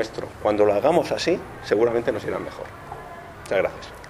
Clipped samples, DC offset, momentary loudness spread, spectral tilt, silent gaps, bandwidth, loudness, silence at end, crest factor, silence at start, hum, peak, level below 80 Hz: under 0.1%; under 0.1%; 18 LU; -5.5 dB/octave; none; 15 kHz; -23 LUFS; 0 s; 18 dB; 0 s; none; -4 dBFS; -50 dBFS